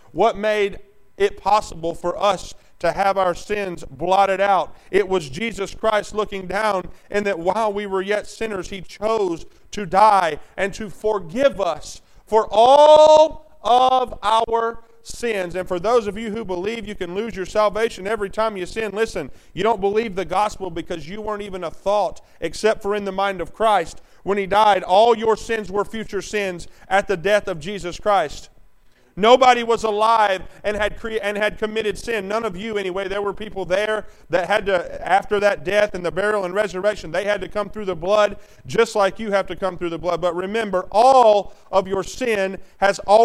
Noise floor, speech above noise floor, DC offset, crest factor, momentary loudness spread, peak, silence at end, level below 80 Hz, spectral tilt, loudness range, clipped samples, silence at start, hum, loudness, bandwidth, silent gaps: -53 dBFS; 33 dB; under 0.1%; 18 dB; 13 LU; 0 dBFS; 0 s; -44 dBFS; -4 dB/octave; 8 LU; under 0.1%; 0.15 s; none; -20 LUFS; 13.5 kHz; none